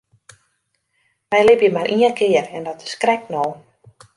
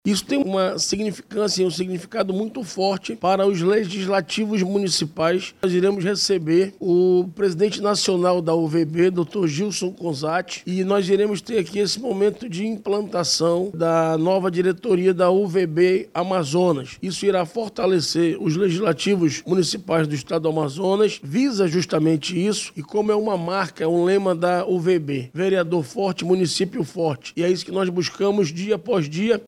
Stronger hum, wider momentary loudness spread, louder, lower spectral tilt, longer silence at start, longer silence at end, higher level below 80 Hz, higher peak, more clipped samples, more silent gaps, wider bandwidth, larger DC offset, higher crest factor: neither; first, 14 LU vs 6 LU; first, -17 LUFS vs -21 LUFS; about the same, -4.5 dB/octave vs -5 dB/octave; first, 1.3 s vs 0.05 s; first, 0.6 s vs 0.05 s; about the same, -60 dBFS vs -62 dBFS; first, -2 dBFS vs -6 dBFS; neither; neither; second, 11.5 kHz vs 13.5 kHz; neither; about the same, 18 dB vs 16 dB